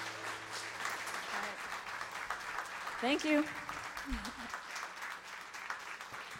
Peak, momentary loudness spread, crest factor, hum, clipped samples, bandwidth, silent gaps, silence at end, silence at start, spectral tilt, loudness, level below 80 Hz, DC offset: -20 dBFS; 10 LU; 20 dB; none; under 0.1%; 16 kHz; none; 0 s; 0 s; -2.5 dB/octave; -39 LUFS; -58 dBFS; under 0.1%